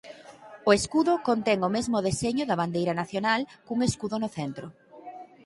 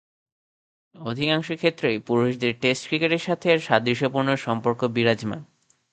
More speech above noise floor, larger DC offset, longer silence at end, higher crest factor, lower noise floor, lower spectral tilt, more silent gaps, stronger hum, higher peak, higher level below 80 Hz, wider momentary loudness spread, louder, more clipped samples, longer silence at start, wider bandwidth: second, 22 dB vs over 67 dB; neither; second, 0.2 s vs 0.5 s; about the same, 20 dB vs 22 dB; second, -48 dBFS vs under -90 dBFS; about the same, -5 dB/octave vs -5.5 dB/octave; neither; neither; second, -6 dBFS vs -2 dBFS; first, -56 dBFS vs -64 dBFS; first, 21 LU vs 6 LU; second, -27 LUFS vs -23 LUFS; neither; second, 0.05 s vs 1 s; first, 11.5 kHz vs 9.2 kHz